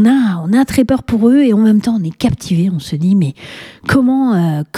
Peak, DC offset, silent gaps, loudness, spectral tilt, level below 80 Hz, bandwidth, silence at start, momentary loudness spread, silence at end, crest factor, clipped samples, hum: 0 dBFS; under 0.1%; none; -13 LUFS; -7 dB/octave; -40 dBFS; 15 kHz; 0 s; 7 LU; 0 s; 12 dB; under 0.1%; none